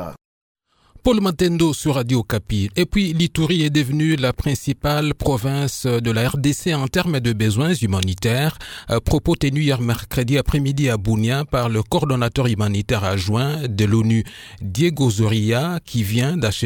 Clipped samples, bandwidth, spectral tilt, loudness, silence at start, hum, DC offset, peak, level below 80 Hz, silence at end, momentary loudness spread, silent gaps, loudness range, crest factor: under 0.1%; 18.5 kHz; -6 dB/octave; -19 LUFS; 0 s; none; under 0.1%; -2 dBFS; -36 dBFS; 0 s; 4 LU; 0.25-0.55 s; 1 LU; 18 dB